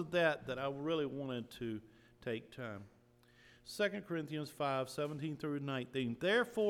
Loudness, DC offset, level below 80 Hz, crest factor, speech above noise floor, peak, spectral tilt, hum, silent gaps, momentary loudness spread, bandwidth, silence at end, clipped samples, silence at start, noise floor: -39 LUFS; under 0.1%; -72 dBFS; 20 dB; 28 dB; -20 dBFS; -5.5 dB/octave; none; none; 14 LU; 18 kHz; 0 s; under 0.1%; 0 s; -67 dBFS